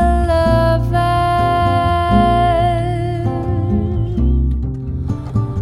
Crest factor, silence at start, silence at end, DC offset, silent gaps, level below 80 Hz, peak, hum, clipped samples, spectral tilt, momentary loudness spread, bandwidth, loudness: 14 dB; 0 s; 0 s; under 0.1%; none; -22 dBFS; -2 dBFS; none; under 0.1%; -8 dB/octave; 7 LU; 12 kHz; -16 LUFS